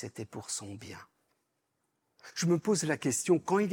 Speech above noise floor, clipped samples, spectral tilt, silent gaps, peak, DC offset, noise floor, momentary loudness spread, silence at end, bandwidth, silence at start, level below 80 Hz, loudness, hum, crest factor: 49 dB; under 0.1%; -4.5 dB/octave; none; -14 dBFS; under 0.1%; -80 dBFS; 18 LU; 0 s; 18.5 kHz; 0 s; -78 dBFS; -31 LUFS; none; 20 dB